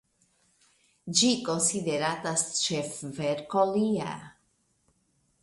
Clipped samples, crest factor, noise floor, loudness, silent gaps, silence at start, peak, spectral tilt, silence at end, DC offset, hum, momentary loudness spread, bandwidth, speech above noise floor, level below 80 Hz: under 0.1%; 22 dB; -71 dBFS; -27 LUFS; none; 1.05 s; -8 dBFS; -3 dB/octave; 1.1 s; under 0.1%; none; 11 LU; 11.5 kHz; 43 dB; -70 dBFS